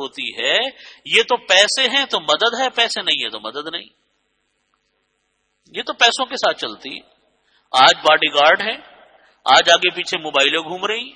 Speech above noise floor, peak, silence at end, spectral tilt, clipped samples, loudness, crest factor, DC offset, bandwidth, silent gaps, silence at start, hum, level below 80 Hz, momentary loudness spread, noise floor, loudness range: 51 dB; 0 dBFS; 0.05 s; -0.5 dB/octave; under 0.1%; -16 LUFS; 18 dB; under 0.1%; 12 kHz; none; 0 s; none; -64 dBFS; 16 LU; -69 dBFS; 8 LU